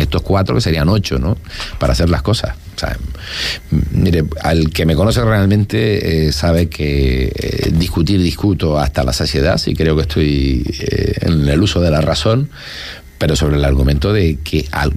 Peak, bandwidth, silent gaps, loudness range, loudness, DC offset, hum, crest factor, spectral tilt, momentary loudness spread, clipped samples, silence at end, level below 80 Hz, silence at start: -2 dBFS; 15.5 kHz; none; 3 LU; -15 LUFS; under 0.1%; none; 12 dB; -6 dB/octave; 7 LU; under 0.1%; 0 s; -22 dBFS; 0 s